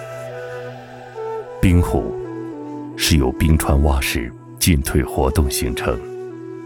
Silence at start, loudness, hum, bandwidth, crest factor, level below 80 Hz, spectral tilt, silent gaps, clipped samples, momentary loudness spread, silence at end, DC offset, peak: 0 s; -19 LUFS; none; over 20 kHz; 16 dB; -26 dBFS; -5 dB/octave; none; under 0.1%; 15 LU; 0 s; under 0.1%; -4 dBFS